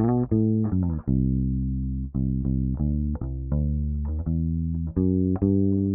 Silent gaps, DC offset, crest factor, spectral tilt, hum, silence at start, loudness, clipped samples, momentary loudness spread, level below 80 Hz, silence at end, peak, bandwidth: none; under 0.1%; 14 dB; -16 dB/octave; none; 0 s; -25 LUFS; under 0.1%; 6 LU; -32 dBFS; 0 s; -10 dBFS; 2 kHz